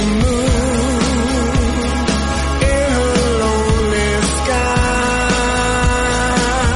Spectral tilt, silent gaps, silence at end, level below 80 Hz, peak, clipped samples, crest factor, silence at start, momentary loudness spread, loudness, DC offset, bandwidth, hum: -4.5 dB/octave; none; 0 s; -20 dBFS; -2 dBFS; under 0.1%; 12 dB; 0 s; 2 LU; -15 LUFS; under 0.1%; 11.5 kHz; none